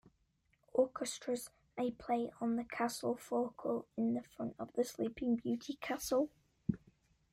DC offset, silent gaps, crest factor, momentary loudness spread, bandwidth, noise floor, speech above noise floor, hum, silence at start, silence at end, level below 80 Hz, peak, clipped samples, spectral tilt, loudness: under 0.1%; none; 20 dB; 7 LU; 16 kHz; -77 dBFS; 39 dB; none; 0.75 s; 0.55 s; -68 dBFS; -20 dBFS; under 0.1%; -5 dB/octave; -39 LUFS